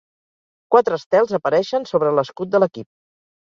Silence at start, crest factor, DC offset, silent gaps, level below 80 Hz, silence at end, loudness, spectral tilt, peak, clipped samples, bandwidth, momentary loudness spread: 0.7 s; 18 dB; under 0.1%; 1.06-1.11 s; -66 dBFS; 0.55 s; -19 LUFS; -6.5 dB/octave; -2 dBFS; under 0.1%; 7.4 kHz; 5 LU